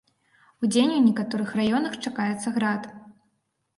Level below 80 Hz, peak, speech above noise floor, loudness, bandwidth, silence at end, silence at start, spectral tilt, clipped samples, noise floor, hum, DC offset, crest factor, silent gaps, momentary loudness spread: -66 dBFS; -8 dBFS; 51 dB; -24 LUFS; 11.5 kHz; 0.65 s; 0.6 s; -5 dB/octave; under 0.1%; -74 dBFS; none; under 0.1%; 18 dB; none; 9 LU